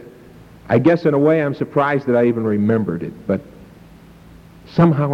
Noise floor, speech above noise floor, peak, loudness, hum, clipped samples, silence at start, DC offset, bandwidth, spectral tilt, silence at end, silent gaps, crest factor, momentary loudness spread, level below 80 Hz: -43 dBFS; 27 dB; -4 dBFS; -17 LUFS; none; under 0.1%; 0 s; under 0.1%; 6.6 kHz; -9.5 dB/octave; 0 s; none; 14 dB; 9 LU; -50 dBFS